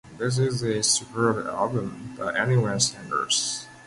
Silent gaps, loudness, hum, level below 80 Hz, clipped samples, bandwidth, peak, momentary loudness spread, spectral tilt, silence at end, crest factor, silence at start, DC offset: none; -24 LUFS; none; -58 dBFS; under 0.1%; 11.5 kHz; -8 dBFS; 7 LU; -3.5 dB/octave; 0 s; 18 dB; 0.05 s; under 0.1%